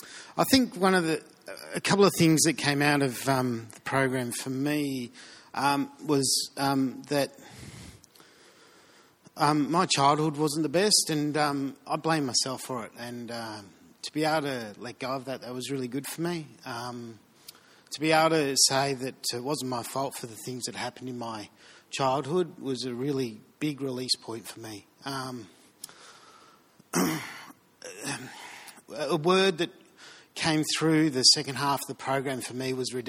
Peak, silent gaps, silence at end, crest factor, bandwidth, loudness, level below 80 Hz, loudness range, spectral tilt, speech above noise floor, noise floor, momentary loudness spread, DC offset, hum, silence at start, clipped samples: -6 dBFS; none; 0 s; 24 dB; 18 kHz; -27 LUFS; -68 dBFS; 10 LU; -3.5 dB/octave; 31 dB; -58 dBFS; 19 LU; under 0.1%; none; 0 s; under 0.1%